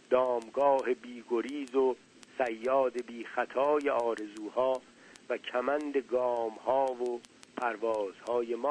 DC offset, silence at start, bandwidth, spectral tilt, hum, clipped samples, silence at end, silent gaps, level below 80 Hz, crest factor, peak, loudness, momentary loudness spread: under 0.1%; 0.1 s; 10.5 kHz; -4.5 dB/octave; none; under 0.1%; 0 s; none; -74 dBFS; 18 dB; -12 dBFS; -32 LUFS; 9 LU